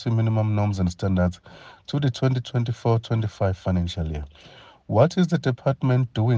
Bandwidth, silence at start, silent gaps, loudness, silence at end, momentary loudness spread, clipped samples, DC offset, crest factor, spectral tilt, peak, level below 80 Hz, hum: 7.6 kHz; 0 s; none; -24 LUFS; 0 s; 9 LU; under 0.1%; under 0.1%; 20 dB; -8 dB/octave; -4 dBFS; -46 dBFS; none